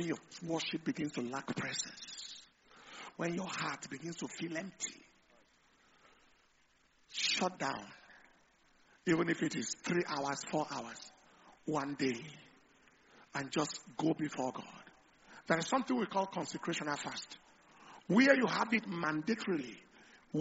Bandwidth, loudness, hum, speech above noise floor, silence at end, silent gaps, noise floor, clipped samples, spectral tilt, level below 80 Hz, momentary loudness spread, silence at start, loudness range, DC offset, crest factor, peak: 8 kHz; -36 LUFS; none; 35 dB; 0 s; none; -71 dBFS; under 0.1%; -3.5 dB/octave; -76 dBFS; 18 LU; 0 s; 8 LU; under 0.1%; 26 dB; -12 dBFS